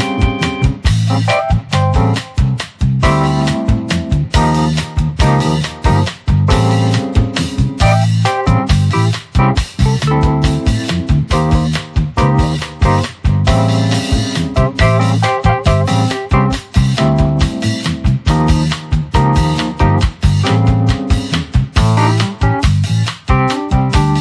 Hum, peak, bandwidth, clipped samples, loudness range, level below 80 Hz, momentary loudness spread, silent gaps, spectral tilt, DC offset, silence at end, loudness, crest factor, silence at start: none; 0 dBFS; 11 kHz; under 0.1%; 1 LU; -20 dBFS; 4 LU; none; -6 dB/octave; under 0.1%; 0 s; -14 LUFS; 12 dB; 0 s